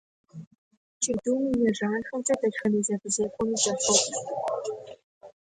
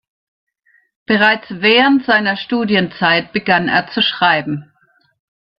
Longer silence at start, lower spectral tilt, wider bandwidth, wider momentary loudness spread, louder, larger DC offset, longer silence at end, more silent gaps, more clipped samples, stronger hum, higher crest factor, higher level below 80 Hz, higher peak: second, 0.35 s vs 1.1 s; second, -3 dB/octave vs -7 dB/octave; first, 11 kHz vs 6 kHz; first, 17 LU vs 7 LU; second, -26 LUFS vs -14 LUFS; neither; second, 0.3 s vs 0.95 s; first, 0.47-0.51 s, 0.58-0.71 s, 0.77-1.01 s, 5.03-5.21 s vs none; neither; neither; first, 22 dB vs 16 dB; about the same, -62 dBFS vs -58 dBFS; second, -8 dBFS vs 0 dBFS